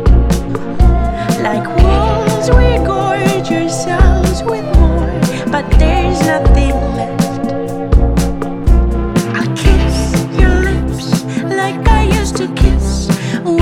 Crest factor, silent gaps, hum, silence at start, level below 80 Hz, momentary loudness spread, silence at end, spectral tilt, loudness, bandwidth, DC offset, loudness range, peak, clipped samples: 12 dB; none; none; 0 s; -14 dBFS; 5 LU; 0 s; -6 dB/octave; -13 LUFS; 14 kHz; under 0.1%; 2 LU; 0 dBFS; 0.3%